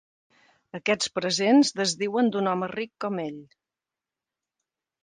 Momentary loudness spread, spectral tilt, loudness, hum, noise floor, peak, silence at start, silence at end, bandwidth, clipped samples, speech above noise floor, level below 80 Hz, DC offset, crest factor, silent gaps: 13 LU; -4 dB/octave; -25 LUFS; none; -90 dBFS; -10 dBFS; 0.75 s; 1.6 s; 9.8 kHz; under 0.1%; 65 dB; -74 dBFS; under 0.1%; 18 dB; none